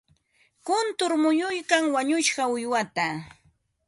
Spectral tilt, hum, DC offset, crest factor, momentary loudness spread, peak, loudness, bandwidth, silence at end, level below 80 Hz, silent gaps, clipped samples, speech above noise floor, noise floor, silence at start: -3 dB/octave; none; under 0.1%; 18 dB; 6 LU; -8 dBFS; -24 LUFS; 11.5 kHz; 0.6 s; -70 dBFS; none; under 0.1%; 41 dB; -66 dBFS; 0.65 s